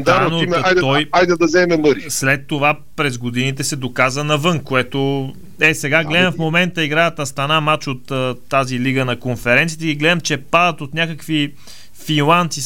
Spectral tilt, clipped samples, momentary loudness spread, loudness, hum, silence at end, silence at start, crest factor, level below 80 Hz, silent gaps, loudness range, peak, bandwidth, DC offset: -4.5 dB/octave; under 0.1%; 7 LU; -16 LUFS; none; 0 s; 0 s; 16 dB; -48 dBFS; none; 2 LU; 0 dBFS; 17 kHz; 2%